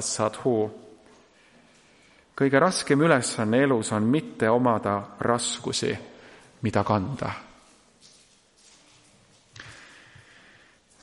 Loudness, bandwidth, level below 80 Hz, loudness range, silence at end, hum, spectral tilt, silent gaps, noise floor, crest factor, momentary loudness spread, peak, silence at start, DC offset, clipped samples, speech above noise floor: -24 LUFS; 11.5 kHz; -64 dBFS; 9 LU; 1.2 s; none; -5 dB/octave; none; -59 dBFS; 22 dB; 22 LU; -6 dBFS; 0 s; under 0.1%; under 0.1%; 35 dB